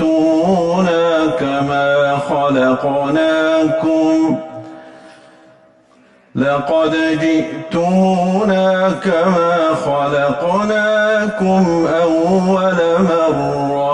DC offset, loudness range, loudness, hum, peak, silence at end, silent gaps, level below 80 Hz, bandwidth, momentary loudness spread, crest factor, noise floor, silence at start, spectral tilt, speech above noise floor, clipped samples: under 0.1%; 5 LU; -14 LUFS; none; -4 dBFS; 0 s; none; -48 dBFS; 10 kHz; 4 LU; 10 dB; -49 dBFS; 0 s; -6.5 dB/octave; 35 dB; under 0.1%